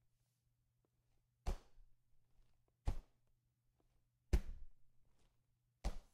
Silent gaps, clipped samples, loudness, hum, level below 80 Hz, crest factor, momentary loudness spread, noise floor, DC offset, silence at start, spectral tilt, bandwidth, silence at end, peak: none; under 0.1%; -48 LUFS; none; -50 dBFS; 26 dB; 14 LU; -83 dBFS; under 0.1%; 1.45 s; -6 dB/octave; 14.5 kHz; 0.15 s; -22 dBFS